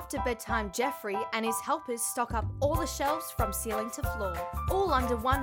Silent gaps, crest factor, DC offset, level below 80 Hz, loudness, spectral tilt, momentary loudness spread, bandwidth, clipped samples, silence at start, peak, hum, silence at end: none; 18 dB; under 0.1%; -40 dBFS; -31 LUFS; -4.5 dB/octave; 6 LU; 20 kHz; under 0.1%; 0 s; -12 dBFS; none; 0 s